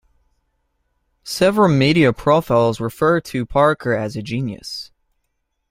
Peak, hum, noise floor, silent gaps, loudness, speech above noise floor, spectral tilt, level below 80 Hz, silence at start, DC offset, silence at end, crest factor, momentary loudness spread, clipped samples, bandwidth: -2 dBFS; none; -72 dBFS; none; -17 LUFS; 55 dB; -6 dB/octave; -48 dBFS; 1.25 s; under 0.1%; 0.85 s; 18 dB; 13 LU; under 0.1%; 16 kHz